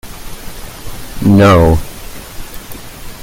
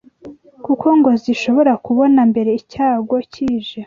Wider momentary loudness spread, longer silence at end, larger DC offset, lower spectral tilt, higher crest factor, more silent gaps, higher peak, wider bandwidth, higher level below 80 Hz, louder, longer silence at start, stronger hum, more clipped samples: first, 23 LU vs 9 LU; about the same, 0 s vs 0 s; neither; about the same, -6.5 dB/octave vs -6.5 dB/octave; about the same, 14 dB vs 14 dB; neither; about the same, 0 dBFS vs -2 dBFS; first, 17 kHz vs 7.4 kHz; first, -28 dBFS vs -54 dBFS; first, -9 LUFS vs -15 LUFS; second, 0.05 s vs 0.25 s; neither; neither